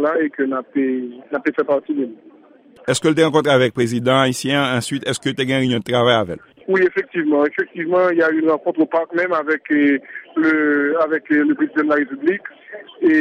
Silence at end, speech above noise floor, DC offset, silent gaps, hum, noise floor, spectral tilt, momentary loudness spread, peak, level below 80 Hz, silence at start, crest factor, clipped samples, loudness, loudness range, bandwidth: 0 s; 30 dB; under 0.1%; none; none; -47 dBFS; -5 dB/octave; 8 LU; -2 dBFS; -60 dBFS; 0 s; 16 dB; under 0.1%; -18 LUFS; 2 LU; 15 kHz